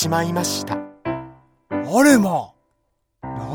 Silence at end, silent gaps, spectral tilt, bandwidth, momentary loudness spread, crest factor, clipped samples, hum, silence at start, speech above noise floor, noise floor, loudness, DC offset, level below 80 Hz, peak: 0 s; none; -4.5 dB/octave; 20 kHz; 19 LU; 20 dB; under 0.1%; none; 0 s; 53 dB; -70 dBFS; -19 LUFS; under 0.1%; -54 dBFS; 0 dBFS